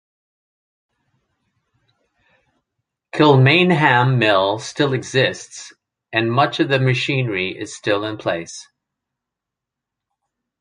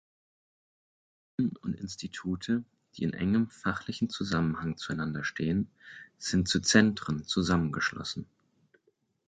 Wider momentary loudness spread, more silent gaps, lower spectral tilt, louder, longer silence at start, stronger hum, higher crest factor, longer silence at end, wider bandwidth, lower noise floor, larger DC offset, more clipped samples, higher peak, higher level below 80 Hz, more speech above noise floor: about the same, 15 LU vs 13 LU; neither; about the same, -5.5 dB/octave vs -4.5 dB/octave; first, -17 LUFS vs -30 LUFS; first, 3.15 s vs 1.4 s; neither; second, 20 dB vs 26 dB; first, 2 s vs 1.05 s; first, 10.5 kHz vs 9.4 kHz; first, -84 dBFS vs -73 dBFS; neither; neither; first, 0 dBFS vs -6 dBFS; about the same, -58 dBFS vs -54 dBFS; first, 67 dB vs 43 dB